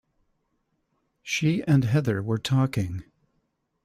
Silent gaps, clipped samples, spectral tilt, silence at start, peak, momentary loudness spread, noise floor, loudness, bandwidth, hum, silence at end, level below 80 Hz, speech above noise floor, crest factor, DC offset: none; under 0.1%; -6.5 dB/octave; 1.25 s; -10 dBFS; 11 LU; -74 dBFS; -25 LUFS; 14.5 kHz; none; 0.85 s; -58 dBFS; 51 dB; 16 dB; under 0.1%